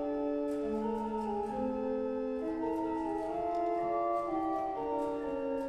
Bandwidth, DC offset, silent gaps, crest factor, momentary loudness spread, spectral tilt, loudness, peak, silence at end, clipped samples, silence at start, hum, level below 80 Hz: 12.5 kHz; under 0.1%; none; 12 dB; 3 LU; -7.5 dB/octave; -35 LUFS; -22 dBFS; 0 s; under 0.1%; 0 s; none; -58 dBFS